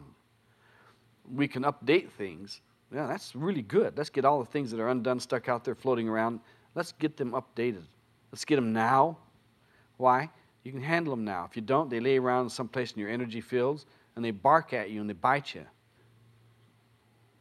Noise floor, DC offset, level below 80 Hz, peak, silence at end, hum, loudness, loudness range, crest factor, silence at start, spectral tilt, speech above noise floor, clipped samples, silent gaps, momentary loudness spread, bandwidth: -66 dBFS; under 0.1%; -74 dBFS; -8 dBFS; 1.75 s; none; -30 LUFS; 3 LU; 22 dB; 0 s; -6 dB/octave; 37 dB; under 0.1%; none; 15 LU; 13.5 kHz